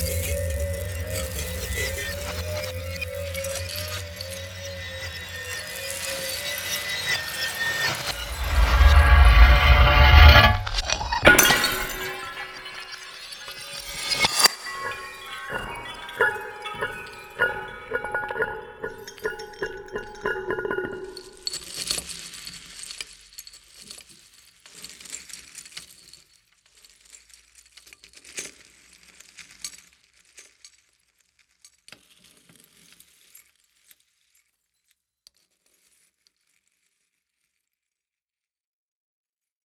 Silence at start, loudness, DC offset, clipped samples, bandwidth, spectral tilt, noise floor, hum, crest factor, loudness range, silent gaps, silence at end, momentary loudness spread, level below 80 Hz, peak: 0 s; -22 LUFS; under 0.1%; under 0.1%; over 20 kHz; -3.5 dB/octave; under -90 dBFS; none; 24 dB; 25 LU; none; 9.3 s; 22 LU; -28 dBFS; 0 dBFS